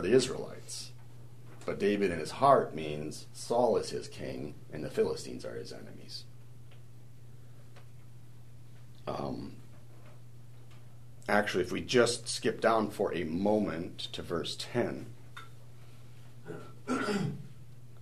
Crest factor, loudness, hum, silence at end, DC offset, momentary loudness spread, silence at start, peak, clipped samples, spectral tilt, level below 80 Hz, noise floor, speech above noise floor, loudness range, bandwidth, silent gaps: 24 dB; -32 LUFS; none; 0 s; 0.5%; 26 LU; 0 s; -10 dBFS; under 0.1%; -5 dB/octave; -62 dBFS; -53 dBFS; 22 dB; 15 LU; 13.5 kHz; none